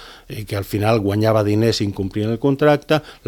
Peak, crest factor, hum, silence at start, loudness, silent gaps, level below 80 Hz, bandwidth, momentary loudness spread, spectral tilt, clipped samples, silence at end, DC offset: -2 dBFS; 18 dB; none; 0 s; -18 LUFS; none; -46 dBFS; 18 kHz; 10 LU; -6.5 dB/octave; under 0.1%; 0.15 s; under 0.1%